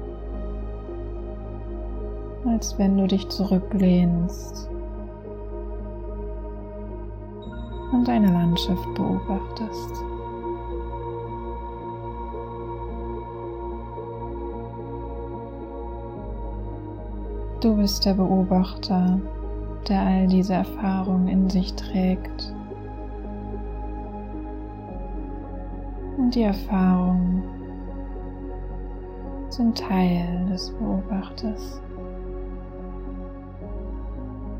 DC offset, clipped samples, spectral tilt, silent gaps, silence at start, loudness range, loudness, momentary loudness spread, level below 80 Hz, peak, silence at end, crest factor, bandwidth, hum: under 0.1%; under 0.1%; -7 dB/octave; none; 0 s; 11 LU; -27 LUFS; 15 LU; -34 dBFS; -10 dBFS; 0 s; 16 dB; 16 kHz; none